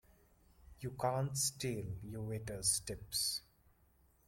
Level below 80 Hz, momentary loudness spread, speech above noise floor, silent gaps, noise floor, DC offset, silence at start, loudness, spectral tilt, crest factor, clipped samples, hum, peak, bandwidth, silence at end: -62 dBFS; 11 LU; 31 dB; none; -71 dBFS; under 0.1%; 0.6 s; -38 LUFS; -3 dB/octave; 20 dB; under 0.1%; none; -20 dBFS; 16.5 kHz; 0.9 s